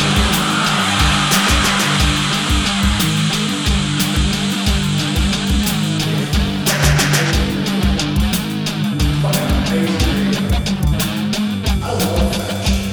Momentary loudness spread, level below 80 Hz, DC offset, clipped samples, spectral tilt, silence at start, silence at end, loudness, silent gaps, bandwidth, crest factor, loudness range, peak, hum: 5 LU; -22 dBFS; under 0.1%; under 0.1%; -4 dB/octave; 0 s; 0 s; -16 LUFS; none; over 20 kHz; 14 dB; 3 LU; -2 dBFS; none